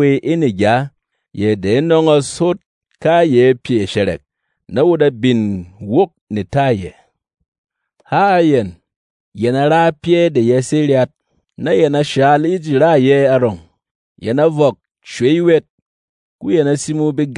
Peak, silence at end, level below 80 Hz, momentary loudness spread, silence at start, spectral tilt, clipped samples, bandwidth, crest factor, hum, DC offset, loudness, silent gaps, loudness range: 0 dBFS; 0 s; -54 dBFS; 10 LU; 0 s; -6.5 dB/octave; under 0.1%; 11 kHz; 14 dB; none; under 0.1%; -14 LUFS; 2.66-2.81 s, 6.21-6.27 s, 7.48-7.52 s, 7.58-7.64 s, 8.96-9.32 s, 13.91-14.16 s, 15.70-16.39 s; 4 LU